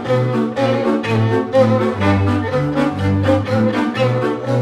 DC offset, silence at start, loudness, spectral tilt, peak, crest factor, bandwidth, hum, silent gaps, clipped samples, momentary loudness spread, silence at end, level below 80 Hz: under 0.1%; 0 s; -16 LUFS; -8 dB/octave; -2 dBFS; 14 dB; 11 kHz; none; none; under 0.1%; 4 LU; 0 s; -46 dBFS